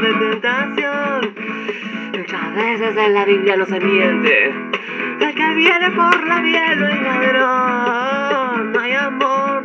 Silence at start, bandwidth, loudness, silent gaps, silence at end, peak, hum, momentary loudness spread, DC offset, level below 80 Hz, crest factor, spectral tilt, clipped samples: 0 s; 7.6 kHz; -16 LUFS; none; 0 s; 0 dBFS; none; 10 LU; under 0.1%; -76 dBFS; 16 dB; -5 dB/octave; under 0.1%